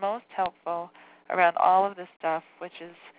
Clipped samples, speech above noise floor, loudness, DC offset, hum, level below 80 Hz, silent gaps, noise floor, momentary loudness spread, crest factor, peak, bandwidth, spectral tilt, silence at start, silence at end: under 0.1%; 18 dB; -27 LUFS; under 0.1%; none; -74 dBFS; 2.16-2.20 s; -44 dBFS; 20 LU; 20 dB; -8 dBFS; 4 kHz; -8 dB/octave; 0 s; 0.1 s